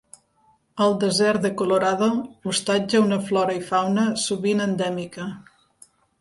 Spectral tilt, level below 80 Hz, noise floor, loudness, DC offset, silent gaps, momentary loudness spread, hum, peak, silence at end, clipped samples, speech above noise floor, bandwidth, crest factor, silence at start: -4.5 dB/octave; -64 dBFS; -62 dBFS; -22 LUFS; under 0.1%; none; 11 LU; none; -8 dBFS; 0.8 s; under 0.1%; 40 dB; 11.5 kHz; 16 dB; 0.75 s